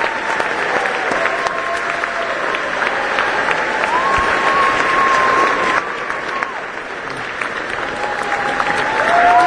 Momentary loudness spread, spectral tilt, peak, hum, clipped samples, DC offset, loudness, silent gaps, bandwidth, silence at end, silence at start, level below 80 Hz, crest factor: 9 LU; -3 dB/octave; 0 dBFS; none; under 0.1%; under 0.1%; -16 LUFS; none; 10.5 kHz; 0 s; 0 s; -46 dBFS; 16 dB